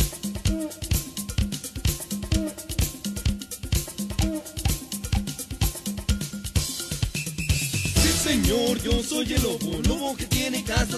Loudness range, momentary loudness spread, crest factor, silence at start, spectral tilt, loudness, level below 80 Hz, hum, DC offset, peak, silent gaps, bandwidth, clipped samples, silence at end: 5 LU; 7 LU; 18 dB; 0 s; -4 dB/octave; -26 LUFS; -32 dBFS; none; under 0.1%; -8 dBFS; none; 14 kHz; under 0.1%; 0 s